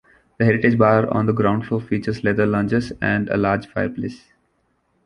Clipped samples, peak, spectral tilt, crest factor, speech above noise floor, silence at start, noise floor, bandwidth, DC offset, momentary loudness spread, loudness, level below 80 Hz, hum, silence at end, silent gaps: under 0.1%; -2 dBFS; -8.5 dB/octave; 18 dB; 47 dB; 0.4 s; -66 dBFS; 10 kHz; under 0.1%; 9 LU; -20 LUFS; -48 dBFS; none; 0.9 s; none